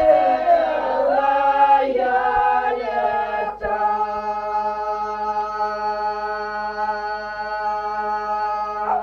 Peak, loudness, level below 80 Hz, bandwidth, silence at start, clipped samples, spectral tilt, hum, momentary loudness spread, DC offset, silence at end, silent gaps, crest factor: -4 dBFS; -21 LUFS; -50 dBFS; 6.8 kHz; 0 s; under 0.1%; -5 dB/octave; 50 Hz at -55 dBFS; 9 LU; under 0.1%; 0 s; none; 16 dB